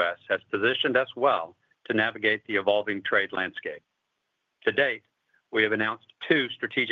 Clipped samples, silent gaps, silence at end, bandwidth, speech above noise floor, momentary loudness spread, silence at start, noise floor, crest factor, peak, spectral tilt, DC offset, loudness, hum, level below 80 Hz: under 0.1%; none; 0 s; 6.6 kHz; 53 dB; 9 LU; 0 s; -79 dBFS; 20 dB; -8 dBFS; -6.5 dB/octave; under 0.1%; -26 LUFS; none; -76 dBFS